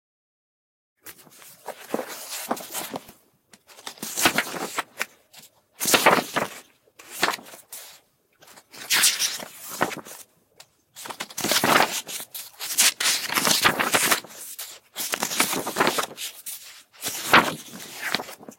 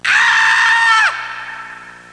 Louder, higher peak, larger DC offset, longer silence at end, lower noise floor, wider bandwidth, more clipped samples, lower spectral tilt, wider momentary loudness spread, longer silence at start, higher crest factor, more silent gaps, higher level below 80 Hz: second, -23 LUFS vs -10 LUFS; about the same, -4 dBFS vs -2 dBFS; neither; second, 0.05 s vs 0.2 s; first, -58 dBFS vs -34 dBFS; first, 17 kHz vs 10.5 kHz; neither; first, -1 dB/octave vs 1.5 dB/octave; first, 22 LU vs 19 LU; first, 1.05 s vs 0.05 s; first, 24 dB vs 12 dB; neither; about the same, -66 dBFS vs -62 dBFS